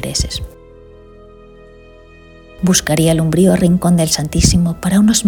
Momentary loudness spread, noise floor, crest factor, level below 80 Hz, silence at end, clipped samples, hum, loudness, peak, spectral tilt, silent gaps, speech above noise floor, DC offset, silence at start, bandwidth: 8 LU; -41 dBFS; 16 dB; -30 dBFS; 0 s; under 0.1%; none; -13 LUFS; 0 dBFS; -5 dB/octave; none; 28 dB; under 0.1%; 0 s; 19 kHz